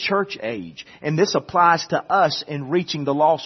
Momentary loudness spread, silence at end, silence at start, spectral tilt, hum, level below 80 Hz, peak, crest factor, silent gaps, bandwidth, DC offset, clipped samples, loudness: 12 LU; 0 s; 0 s; -5 dB/octave; none; -62 dBFS; -2 dBFS; 18 dB; none; 6.4 kHz; under 0.1%; under 0.1%; -20 LUFS